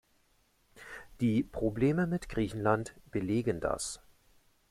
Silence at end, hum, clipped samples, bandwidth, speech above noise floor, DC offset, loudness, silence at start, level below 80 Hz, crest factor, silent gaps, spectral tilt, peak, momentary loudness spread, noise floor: 0.75 s; none; under 0.1%; 15 kHz; 39 dB; under 0.1%; -32 LUFS; 0.75 s; -54 dBFS; 22 dB; none; -6 dB/octave; -12 dBFS; 18 LU; -70 dBFS